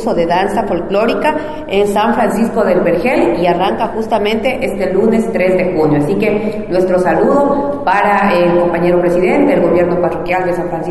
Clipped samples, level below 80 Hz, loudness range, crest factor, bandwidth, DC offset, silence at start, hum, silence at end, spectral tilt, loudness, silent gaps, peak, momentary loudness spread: under 0.1%; -36 dBFS; 2 LU; 12 dB; 12.5 kHz; under 0.1%; 0 s; none; 0 s; -6.5 dB/octave; -13 LUFS; none; -2 dBFS; 5 LU